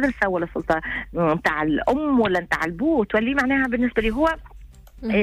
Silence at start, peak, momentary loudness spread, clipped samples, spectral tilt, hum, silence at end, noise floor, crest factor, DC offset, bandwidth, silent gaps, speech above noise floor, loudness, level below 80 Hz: 0 s; -8 dBFS; 4 LU; under 0.1%; -6.5 dB/octave; none; 0 s; -43 dBFS; 14 dB; under 0.1%; 15 kHz; none; 22 dB; -22 LUFS; -40 dBFS